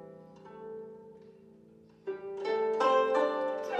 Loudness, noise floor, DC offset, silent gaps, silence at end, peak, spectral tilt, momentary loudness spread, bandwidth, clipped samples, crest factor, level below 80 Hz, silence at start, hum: -30 LUFS; -58 dBFS; under 0.1%; none; 0 s; -16 dBFS; -4.5 dB/octave; 25 LU; 8.6 kHz; under 0.1%; 18 dB; -80 dBFS; 0 s; none